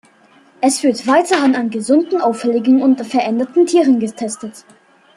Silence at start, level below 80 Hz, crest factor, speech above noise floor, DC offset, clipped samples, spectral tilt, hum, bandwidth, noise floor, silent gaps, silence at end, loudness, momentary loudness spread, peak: 0.6 s; -68 dBFS; 14 dB; 35 dB; under 0.1%; under 0.1%; -4 dB/octave; none; 12.5 kHz; -49 dBFS; none; 0.55 s; -15 LUFS; 9 LU; -2 dBFS